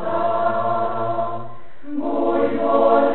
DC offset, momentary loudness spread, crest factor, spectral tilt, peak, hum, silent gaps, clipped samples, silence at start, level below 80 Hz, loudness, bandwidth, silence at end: 5%; 13 LU; 16 dB; -11.5 dB/octave; -4 dBFS; none; none; under 0.1%; 0 s; -56 dBFS; -20 LUFS; 4.2 kHz; 0 s